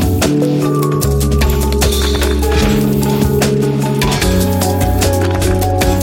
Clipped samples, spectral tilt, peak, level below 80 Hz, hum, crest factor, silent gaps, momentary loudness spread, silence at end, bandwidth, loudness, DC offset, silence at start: under 0.1%; -5.5 dB/octave; 0 dBFS; -20 dBFS; none; 12 dB; none; 1 LU; 0 s; 17 kHz; -13 LUFS; under 0.1%; 0 s